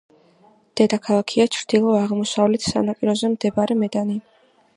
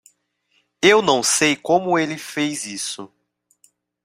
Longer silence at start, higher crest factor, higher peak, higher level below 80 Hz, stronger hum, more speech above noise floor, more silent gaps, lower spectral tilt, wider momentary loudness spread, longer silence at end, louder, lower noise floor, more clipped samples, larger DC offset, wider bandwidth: about the same, 0.75 s vs 0.8 s; about the same, 20 dB vs 20 dB; about the same, -2 dBFS vs -2 dBFS; about the same, -58 dBFS vs -62 dBFS; neither; second, 36 dB vs 48 dB; neither; first, -5 dB/octave vs -2.5 dB/octave; second, 5 LU vs 12 LU; second, 0.55 s vs 1 s; about the same, -20 LUFS vs -18 LUFS; second, -55 dBFS vs -67 dBFS; neither; neither; second, 11 kHz vs 16 kHz